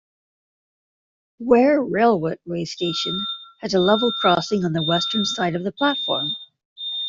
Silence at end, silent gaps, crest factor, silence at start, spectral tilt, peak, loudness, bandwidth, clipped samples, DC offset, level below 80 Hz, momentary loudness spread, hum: 0 s; 6.65-6.76 s; 18 dB; 1.4 s; -5 dB/octave; -4 dBFS; -20 LUFS; 7.8 kHz; under 0.1%; under 0.1%; -60 dBFS; 11 LU; none